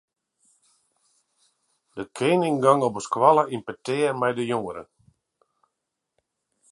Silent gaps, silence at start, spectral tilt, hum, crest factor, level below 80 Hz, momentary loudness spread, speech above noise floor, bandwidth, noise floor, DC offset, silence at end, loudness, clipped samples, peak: none; 1.95 s; -5.5 dB/octave; none; 24 dB; -70 dBFS; 18 LU; 60 dB; 11.5 kHz; -82 dBFS; under 0.1%; 1.9 s; -22 LUFS; under 0.1%; -2 dBFS